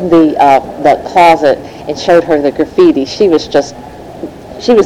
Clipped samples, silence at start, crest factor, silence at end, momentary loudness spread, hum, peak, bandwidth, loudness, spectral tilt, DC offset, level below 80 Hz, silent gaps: under 0.1%; 0 s; 10 dB; 0 s; 19 LU; none; 0 dBFS; 14 kHz; -9 LUFS; -5.5 dB/octave; 0.4%; -42 dBFS; none